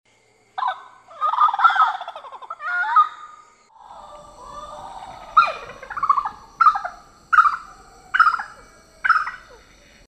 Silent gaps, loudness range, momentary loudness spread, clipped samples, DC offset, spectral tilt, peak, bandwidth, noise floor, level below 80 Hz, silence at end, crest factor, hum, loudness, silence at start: none; 5 LU; 22 LU; under 0.1%; under 0.1%; -1.5 dB/octave; -2 dBFS; 9.6 kHz; -59 dBFS; -56 dBFS; 0.7 s; 20 dB; none; -19 LUFS; 0.55 s